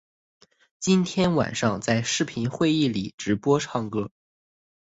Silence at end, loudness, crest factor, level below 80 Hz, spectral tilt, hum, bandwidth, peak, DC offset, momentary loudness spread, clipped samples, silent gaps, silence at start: 0.8 s; -24 LUFS; 18 dB; -56 dBFS; -5 dB/octave; none; 8 kHz; -8 dBFS; under 0.1%; 8 LU; under 0.1%; 3.14-3.18 s; 0.8 s